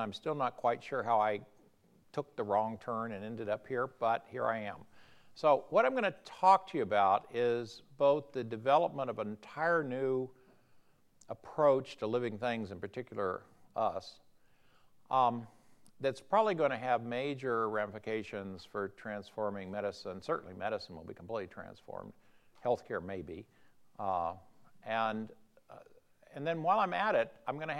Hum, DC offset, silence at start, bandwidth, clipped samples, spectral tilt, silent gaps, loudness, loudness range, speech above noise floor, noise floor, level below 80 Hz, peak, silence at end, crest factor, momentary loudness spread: none; under 0.1%; 0 s; 11.5 kHz; under 0.1%; -6.5 dB/octave; none; -34 LUFS; 9 LU; 32 dB; -66 dBFS; -76 dBFS; -12 dBFS; 0 s; 22 dB; 15 LU